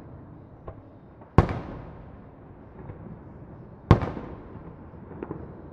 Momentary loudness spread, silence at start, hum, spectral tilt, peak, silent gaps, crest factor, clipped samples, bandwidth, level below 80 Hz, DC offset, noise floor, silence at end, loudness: 24 LU; 0 s; none; -9 dB/octave; 0 dBFS; none; 30 dB; under 0.1%; 7 kHz; -38 dBFS; under 0.1%; -48 dBFS; 0 s; -27 LUFS